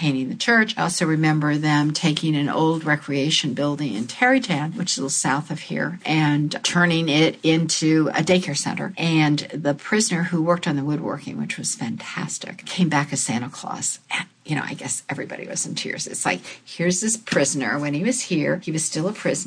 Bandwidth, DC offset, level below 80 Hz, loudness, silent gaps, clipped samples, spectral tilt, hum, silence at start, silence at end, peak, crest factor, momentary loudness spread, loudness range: 10.5 kHz; under 0.1%; -66 dBFS; -22 LUFS; none; under 0.1%; -4 dB/octave; none; 0 s; 0 s; -4 dBFS; 18 dB; 9 LU; 5 LU